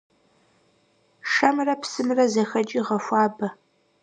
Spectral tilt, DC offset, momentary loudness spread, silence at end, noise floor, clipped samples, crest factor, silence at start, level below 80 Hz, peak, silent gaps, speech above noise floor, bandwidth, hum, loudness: -4.5 dB/octave; under 0.1%; 9 LU; 0.5 s; -64 dBFS; under 0.1%; 22 dB; 1.25 s; -80 dBFS; -2 dBFS; none; 41 dB; 9.6 kHz; none; -23 LUFS